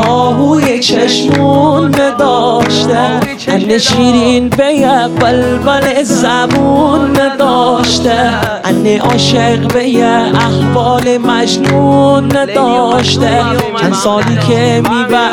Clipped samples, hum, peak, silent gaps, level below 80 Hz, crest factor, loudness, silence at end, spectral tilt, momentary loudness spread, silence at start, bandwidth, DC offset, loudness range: under 0.1%; none; 0 dBFS; none; -36 dBFS; 8 dB; -9 LUFS; 0 s; -5 dB/octave; 3 LU; 0 s; 18 kHz; 0.3%; 1 LU